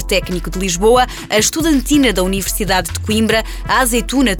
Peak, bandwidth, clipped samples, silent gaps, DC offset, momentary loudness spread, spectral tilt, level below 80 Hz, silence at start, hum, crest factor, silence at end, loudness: -2 dBFS; 19.5 kHz; under 0.1%; none; under 0.1%; 5 LU; -3.5 dB/octave; -26 dBFS; 0 s; none; 12 dB; 0 s; -15 LUFS